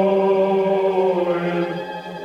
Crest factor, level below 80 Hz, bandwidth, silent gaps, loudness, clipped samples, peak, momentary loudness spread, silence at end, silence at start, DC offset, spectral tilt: 12 dB; -62 dBFS; 6.8 kHz; none; -19 LUFS; under 0.1%; -6 dBFS; 9 LU; 0 s; 0 s; under 0.1%; -8 dB/octave